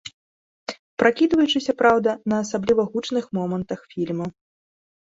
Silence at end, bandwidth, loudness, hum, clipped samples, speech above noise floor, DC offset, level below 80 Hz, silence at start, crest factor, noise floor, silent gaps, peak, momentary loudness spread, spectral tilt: 0.8 s; 8 kHz; -22 LUFS; none; under 0.1%; over 69 dB; under 0.1%; -58 dBFS; 0.05 s; 22 dB; under -90 dBFS; 0.13-0.66 s, 0.79-0.97 s; 0 dBFS; 16 LU; -5.5 dB/octave